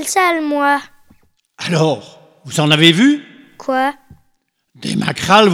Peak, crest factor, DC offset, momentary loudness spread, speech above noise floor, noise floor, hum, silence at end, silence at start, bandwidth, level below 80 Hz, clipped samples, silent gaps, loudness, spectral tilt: 0 dBFS; 16 dB; under 0.1%; 14 LU; 50 dB; -64 dBFS; none; 0 s; 0 s; 19 kHz; -56 dBFS; 0.1%; none; -14 LUFS; -4.5 dB/octave